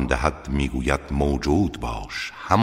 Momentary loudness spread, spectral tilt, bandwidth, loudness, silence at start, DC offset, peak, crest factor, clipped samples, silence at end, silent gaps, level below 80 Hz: 8 LU; -6 dB/octave; 15 kHz; -24 LUFS; 0 s; under 0.1%; -2 dBFS; 20 dB; under 0.1%; 0 s; none; -30 dBFS